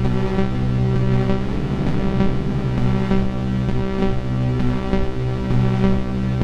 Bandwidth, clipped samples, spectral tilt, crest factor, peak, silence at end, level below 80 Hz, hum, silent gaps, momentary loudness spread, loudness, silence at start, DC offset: 7.6 kHz; under 0.1%; -8.5 dB/octave; 14 dB; -4 dBFS; 0 s; -26 dBFS; none; none; 3 LU; -21 LUFS; 0 s; under 0.1%